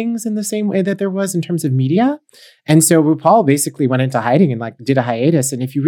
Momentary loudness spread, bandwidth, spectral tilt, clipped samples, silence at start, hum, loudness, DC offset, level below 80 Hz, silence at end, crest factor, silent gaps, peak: 8 LU; 19 kHz; -6 dB/octave; under 0.1%; 0 s; none; -15 LUFS; under 0.1%; -68 dBFS; 0 s; 14 dB; none; 0 dBFS